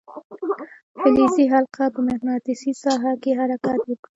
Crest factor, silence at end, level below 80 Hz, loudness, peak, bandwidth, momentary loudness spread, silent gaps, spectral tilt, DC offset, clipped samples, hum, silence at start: 18 dB; 0.2 s; -58 dBFS; -21 LUFS; -4 dBFS; 8 kHz; 12 LU; 0.24-0.30 s, 0.83-0.95 s; -5.5 dB/octave; under 0.1%; under 0.1%; none; 0.1 s